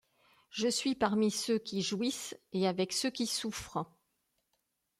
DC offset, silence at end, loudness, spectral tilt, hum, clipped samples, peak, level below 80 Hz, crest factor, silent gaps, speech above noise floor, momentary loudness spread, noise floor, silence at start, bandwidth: under 0.1%; 1.15 s; -33 LUFS; -3.5 dB/octave; none; under 0.1%; -16 dBFS; -68 dBFS; 20 dB; none; 48 dB; 10 LU; -81 dBFS; 0.55 s; 15.5 kHz